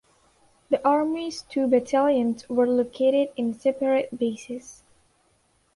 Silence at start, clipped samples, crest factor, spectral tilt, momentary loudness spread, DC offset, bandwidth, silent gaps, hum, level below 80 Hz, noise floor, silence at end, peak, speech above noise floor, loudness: 0.7 s; under 0.1%; 16 dB; -5 dB/octave; 8 LU; under 0.1%; 11.5 kHz; none; none; -66 dBFS; -66 dBFS; 1 s; -8 dBFS; 42 dB; -24 LUFS